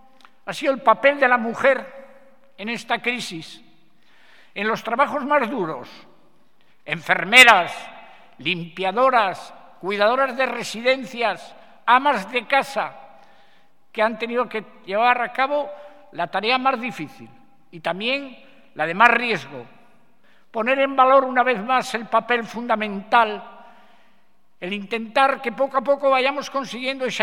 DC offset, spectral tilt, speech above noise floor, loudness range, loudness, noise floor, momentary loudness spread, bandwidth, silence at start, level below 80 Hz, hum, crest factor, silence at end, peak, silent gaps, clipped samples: 0.4%; -3 dB/octave; 44 dB; 8 LU; -20 LUFS; -64 dBFS; 17 LU; 18 kHz; 0.45 s; -72 dBFS; none; 22 dB; 0 s; 0 dBFS; none; under 0.1%